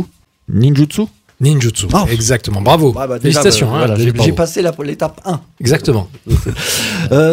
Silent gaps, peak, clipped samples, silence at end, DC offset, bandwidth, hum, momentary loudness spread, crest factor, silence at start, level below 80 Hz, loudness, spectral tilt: none; 0 dBFS; under 0.1%; 0 s; under 0.1%; 16.5 kHz; none; 9 LU; 12 dB; 0 s; -30 dBFS; -13 LUFS; -5 dB/octave